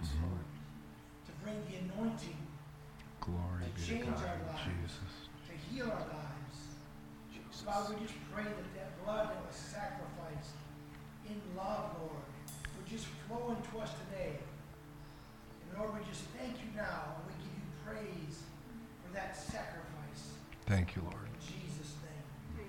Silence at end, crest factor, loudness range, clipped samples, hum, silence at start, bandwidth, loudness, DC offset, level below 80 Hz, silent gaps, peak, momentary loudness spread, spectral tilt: 0 s; 22 dB; 4 LU; under 0.1%; none; 0 s; 17 kHz; -44 LUFS; under 0.1%; -54 dBFS; none; -22 dBFS; 13 LU; -6 dB/octave